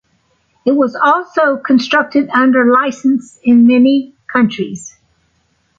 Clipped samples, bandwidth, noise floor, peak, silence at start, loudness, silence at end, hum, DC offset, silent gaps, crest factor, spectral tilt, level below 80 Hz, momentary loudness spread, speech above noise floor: under 0.1%; 7.8 kHz; -60 dBFS; 0 dBFS; 0.65 s; -12 LUFS; 0.9 s; none; under 0.1%; none; 12 dB; -5.5 dB/octave; -58 dBFS; 9 LU; 48 dB